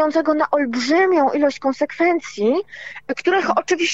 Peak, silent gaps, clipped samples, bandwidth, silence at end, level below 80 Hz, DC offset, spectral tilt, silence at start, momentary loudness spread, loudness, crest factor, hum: -6 dBFS; none; under 0.1%; 8 kHz; 0 s; -64 dBFS; 0.3%; -3.5 dB/octave; 0 s; 7 LU; -19 LUFS; 12 dB; none